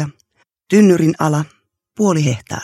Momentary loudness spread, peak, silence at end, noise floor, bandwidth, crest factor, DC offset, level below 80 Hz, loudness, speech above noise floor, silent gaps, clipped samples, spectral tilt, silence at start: 12 LU; 0 dBFS; 0 s; -61 dBFS; 14 kHz; 16 dB; under 0.1%; -56 dBFS; -15 LUFS; 48 dB; none; under 0.1%; -6.5 dB/octave; 0 s